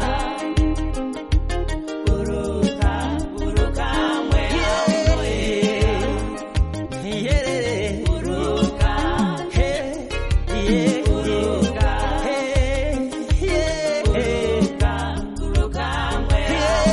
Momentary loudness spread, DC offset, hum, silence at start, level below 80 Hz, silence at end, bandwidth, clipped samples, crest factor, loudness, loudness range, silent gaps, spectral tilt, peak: 6 LU; under 0.1%; none; 0 s; -24 dBFS; 0 s; 11.5 kHz; under 0.1%; 16 dB; -21 LUFS; 2 LU; none; -5.5 dB/octave; -4 dBFS